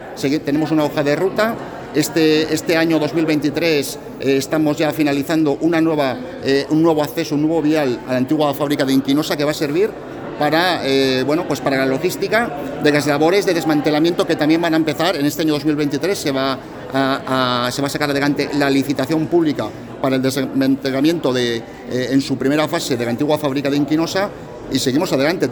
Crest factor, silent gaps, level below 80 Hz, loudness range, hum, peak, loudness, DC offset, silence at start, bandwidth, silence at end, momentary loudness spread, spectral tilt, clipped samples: 16 dB; none; -50 dBFS; 2 LU; none; -2 dBFS; -18 LUFS; under 0.1%; 0 s; over 20 kHz; 0 s; 5 LU; -5 dB/octave; under 0.1%